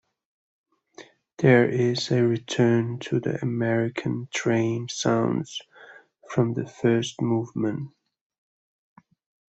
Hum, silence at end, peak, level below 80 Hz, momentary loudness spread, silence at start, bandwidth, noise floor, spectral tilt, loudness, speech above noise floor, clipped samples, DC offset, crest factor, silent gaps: none; 1.6 s; -6 dBFS; -64 dBFS; 10 LU; 1 s; 8.2 kHz; -50 dBFS; -6 dB/octave; -24 LUFS; 27 dB; under 0.1%; under 0.1%; 20 dB; none